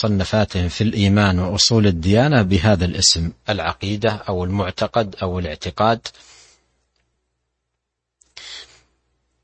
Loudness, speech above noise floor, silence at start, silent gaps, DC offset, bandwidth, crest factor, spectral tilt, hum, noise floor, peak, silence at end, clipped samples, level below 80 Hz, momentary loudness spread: -18 LUFS; 60 dB; 0 s; none; under 0.1%; 8.8 kHz; 18 dB; -4.5 dB/octave; none; -78 dBFS; -2 dBFS; 0.8 s; under 0.1%; -40 dBFS; 12 LU